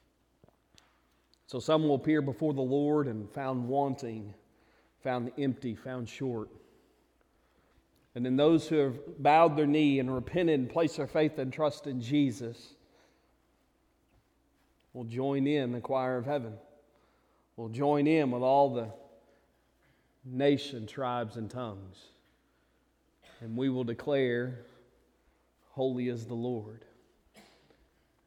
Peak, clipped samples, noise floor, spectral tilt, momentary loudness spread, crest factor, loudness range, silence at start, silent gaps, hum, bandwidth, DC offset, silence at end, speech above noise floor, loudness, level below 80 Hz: -10 dBFS; under 0.1%; -71 dBFS; -7 dB/octave; 16 LU; 22 dB; 10 LU; 1.5 s; none; none; 11.5 kHz; under 0.1%; 0.85 s; 41 dB; -31 LUFS; -68 dBFS